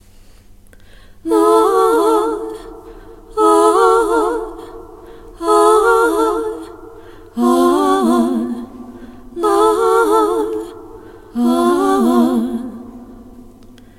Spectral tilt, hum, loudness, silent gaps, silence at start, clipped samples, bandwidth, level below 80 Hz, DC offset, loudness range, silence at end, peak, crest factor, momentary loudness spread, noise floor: -4.5 dB/octave; none; -14 LUFS; none; 1.25 s; under 0.1%; 16.5 kHz; -44 dBFS; under 0.1%; 3 LU; 0.55 s; 0 dBFS; 16 dB; 21 LU; -42 dBFS